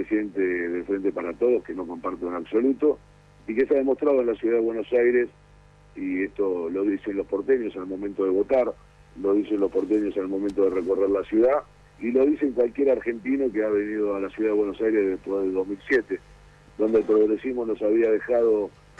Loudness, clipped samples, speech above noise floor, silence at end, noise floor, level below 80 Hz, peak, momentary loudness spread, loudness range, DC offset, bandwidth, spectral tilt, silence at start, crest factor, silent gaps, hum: -24 LUFS; under 0.1%; 29 dB; 0.3 s; -53 dBFS; -56 dBFS; -12 dBFS; 9 LU; 2 LU; under 0.1%; 6.8 kHz; -7.5 dB/octave; 0 s; 12 dB; none; 50 Hz at -55 dBFS